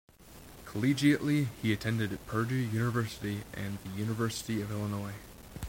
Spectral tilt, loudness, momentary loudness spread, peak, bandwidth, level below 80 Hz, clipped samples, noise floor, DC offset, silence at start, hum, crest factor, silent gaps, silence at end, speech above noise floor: -6 dB/octave; -32 LUFS; 15 LU; -14 dBFS; 16.5 kHz; -56 dBFS; under 0.1%; -52 dBFS; under 0.1%; 0.2 s; none; 18 dB; none; 0 s; 21 dB